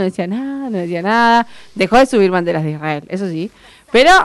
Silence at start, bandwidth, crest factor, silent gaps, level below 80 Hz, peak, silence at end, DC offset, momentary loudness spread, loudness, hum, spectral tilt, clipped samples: 0 s; 12 kHz; 12 dB; none; -40 dBFS; -2 dBFS; 0 s; under 0.1%; 11 LU; -15 LUFS; none; -5 dB/octave; under 0.1%